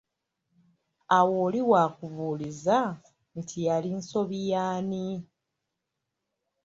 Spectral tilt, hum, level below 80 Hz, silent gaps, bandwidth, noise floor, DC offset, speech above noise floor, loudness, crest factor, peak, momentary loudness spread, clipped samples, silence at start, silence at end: -6 dB/octave; none; -70 dBFS; none; 7.8 kHz; -84 dBFS; under 0.1%; 57 dB; -27 LUFS; 20 dB; -8 dBFS; 15 LU; under 0.1%; 1.1 s; 1.4 s